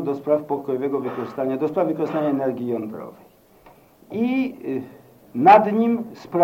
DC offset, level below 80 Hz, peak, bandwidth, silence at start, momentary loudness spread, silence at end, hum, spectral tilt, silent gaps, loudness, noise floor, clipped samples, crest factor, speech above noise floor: under 0.1%; -68 dBFS; -2 dBFS; 16.5 kHz; 0 s; 19 LU; 0 s; none; -8 dB/octave; none; -21 LUFS; -51 dBFS; under 0.1%; 20 dB; 31 dB